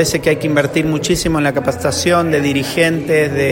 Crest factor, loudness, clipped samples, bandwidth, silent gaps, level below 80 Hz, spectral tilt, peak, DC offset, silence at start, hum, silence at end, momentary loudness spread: 14 dB; -15 LUFS; under 0.1%; 16.5 kHz; none; -38 dBFS; -4.5 dB/octave; 0 dBFS; under 0.1%; 0 s; none; 0 s; 3 LU